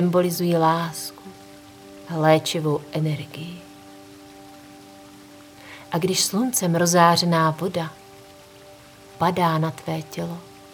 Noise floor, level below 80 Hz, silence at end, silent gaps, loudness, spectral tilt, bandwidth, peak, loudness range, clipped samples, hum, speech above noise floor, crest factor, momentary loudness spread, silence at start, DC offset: -46 dBFS; -64 dBFS; 0.05 s; none; -22 LUFS; -4.5 dB/octave; over 20 kHz; -2 dBFS; 9 LU; under 0.1%; none; 25 dB; 22 dB; 24 LU; 0 s; under 0.1%